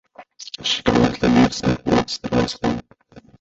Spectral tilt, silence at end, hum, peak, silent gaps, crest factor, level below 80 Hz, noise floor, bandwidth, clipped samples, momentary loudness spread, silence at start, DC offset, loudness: -5 dB/octave; 0.2 s; none; -2 dBFS; none; 18 dB; -40 dBFS; -48 dBFS; 8 kHz; under 0.1%; 12 LU; 0.2 s; under 0.1%; -19 LUFS